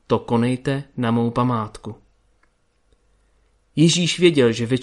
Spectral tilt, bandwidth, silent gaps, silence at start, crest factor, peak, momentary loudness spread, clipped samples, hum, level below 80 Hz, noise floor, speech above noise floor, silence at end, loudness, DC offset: -5.5 dB/octave; 11.5 kHz; none; 0.1 s; 18 dB; -2 dBFS; 14 LU; under 0.1%; none; -54 dBFS; -62 dBFS; 43 dB; 0 s; -19 LUFS; under 0.1%